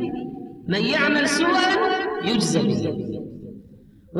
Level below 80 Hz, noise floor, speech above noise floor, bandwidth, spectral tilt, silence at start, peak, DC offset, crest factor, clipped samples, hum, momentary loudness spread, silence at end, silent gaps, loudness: -54 dBFS; -48 dBFS; 27 dB; 12.5 kHz; -4.5 dB/octave; 0 s; -8 dBFS; under 0.1%; 14 dB; under 0.1%; none; 16 LU; 0 s; none; -21 LUFS